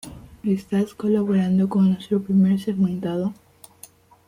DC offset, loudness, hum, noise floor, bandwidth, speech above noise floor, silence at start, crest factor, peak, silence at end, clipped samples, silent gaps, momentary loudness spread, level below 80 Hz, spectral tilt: under 0.1%; -22 LUFS; none; -49 dBFS; 15.5 kHz; 29 dB; 0.05 s; 12 dB; -10 dBFS; 0.95 s; under 0.1%; none; 8 LU; -56 dBFS; -8.5 dB/octave